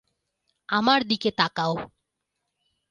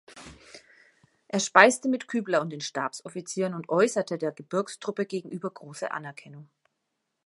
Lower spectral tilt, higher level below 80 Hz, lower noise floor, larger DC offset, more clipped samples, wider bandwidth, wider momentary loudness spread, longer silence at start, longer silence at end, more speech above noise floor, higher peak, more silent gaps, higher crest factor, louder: about the same, -5 dB/octave vs -4 dB/octave; first, -64 dBFS vs -72 dBFS; about the same, -81 dBFS vs -80 dBFS; neither; neither; about the same, 10.5 kHz vs 11.5 kHz; second, 10 LU vs 18 LU; first, 0.7 s vs 0.1 s; first, 1.05 s vs 0.8 s; first, 57 dB vs 53 dB; second, -6 dBFS vs 0 dBFS; neither; second, 22 dB vs 28 dB; first, -24 LUFS vs -27 LUFS